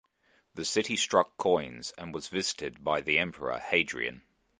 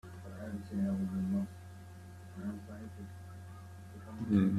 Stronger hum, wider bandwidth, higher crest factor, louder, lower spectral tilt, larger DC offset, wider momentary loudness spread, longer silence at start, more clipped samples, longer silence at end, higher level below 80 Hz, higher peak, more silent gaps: neither; second, 10 kHz vs 13 kHz; about the same, 24 dB vs 20 dB; first, -30 LUFS vs -38 LUFS; second, -2.5 dB/octave vs -8.5 dB/octave; neither; second, 12 LU vs 16 LU; first, 0.55 s vs 0.05 s; neither; first, 0.4 s vs 0 s; about the same, -62 dBFS vs -66 dBFS; first, -8 dBFS vs -16 dBFS; neither